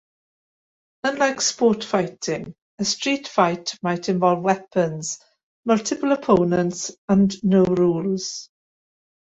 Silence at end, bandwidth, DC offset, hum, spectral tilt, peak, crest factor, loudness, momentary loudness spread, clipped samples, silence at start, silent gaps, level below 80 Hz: 0.9 s; 8 kHz; under 0.1%; none; -5 dB/octave; -2 dBFS; 20 dB; -21 LUFS; 11 LU; under 0.1%; 1.05 s; 2.62-2.78 s, 5.43-5.63 s, 6.98-7.08 s; -58 dBFS